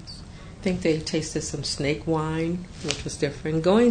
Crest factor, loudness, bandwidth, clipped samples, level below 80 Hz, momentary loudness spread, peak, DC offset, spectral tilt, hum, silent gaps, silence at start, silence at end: 24 dB; -26 LUFS; 9.6 kHz; under 0.1%; -44 dBFS; 8 LU; -2 dBFS; under 0.1%; -5 dB/octave; none; none; 0 s; 0 s